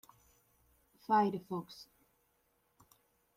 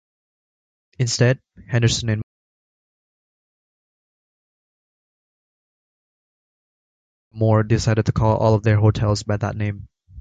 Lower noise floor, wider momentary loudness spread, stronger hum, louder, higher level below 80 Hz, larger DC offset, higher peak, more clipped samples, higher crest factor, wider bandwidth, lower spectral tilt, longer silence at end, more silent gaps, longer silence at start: second, -77 dBFS vs under -90 dBFS; first, 23 LU vs 10 LU; neither; second, -34 LUFS vs -20 LUFS; second, -78 dBFS vs -42 dBFS; neither; second, -20 dBFS vs -2 dBFS; neither; about the same, 20 dB vs 20 dB; first, 16 kHz vs 9.2 kHz; about the same, -6.5 dB/octave vs -6 dB/octave; first, 1.55 s vs 0 s; second, none vs 2.23-7.31 s; about the same, 1.1 s vs 1 s